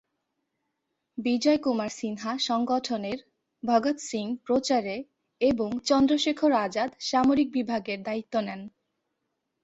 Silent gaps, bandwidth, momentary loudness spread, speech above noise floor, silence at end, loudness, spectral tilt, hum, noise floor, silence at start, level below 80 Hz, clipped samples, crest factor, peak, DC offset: none; 8.2 kHz; 12 LU; 55 dB; 0.95 s; -27 LUFS; -4 dB/octave; none; -81 dBFS; 1.15 s; -64 dBFS; under 0.1%; 18 dB; -8 dBFS; under 0.1%